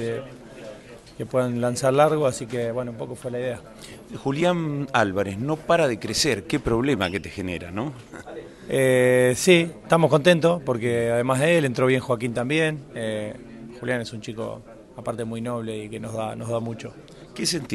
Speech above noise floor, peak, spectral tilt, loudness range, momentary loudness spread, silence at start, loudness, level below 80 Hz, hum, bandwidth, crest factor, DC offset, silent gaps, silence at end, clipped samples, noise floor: 19 dB; -4 dBFS; -5 dB/octave; 11 LU; 21 LU; 0 s; -23 LUFS; -52 dBFS; none; 16 kHz; 20 dB; under 0.1%; none; 0 s; under 0.1%; -43 dBFS